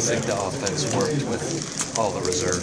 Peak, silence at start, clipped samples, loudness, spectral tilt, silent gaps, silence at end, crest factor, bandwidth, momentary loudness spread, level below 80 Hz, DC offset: -6 dBFS; 0 s; under 0.1%; -24 LUFS; -3.5 dB/octave; none; 0 s; 18 dB; 11 kHz; 4 LU; -52 dBFS; under 0.1%